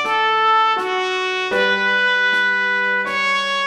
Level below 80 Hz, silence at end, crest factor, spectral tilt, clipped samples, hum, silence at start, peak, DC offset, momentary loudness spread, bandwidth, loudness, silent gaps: -62 dBFS; 0 s; 12 dB; -2.5 dB/octave; under 0.1%; none; 0 s; -6 dBFS; under 0.1%; 5 LU; 13 kHz; -16 LUFS; none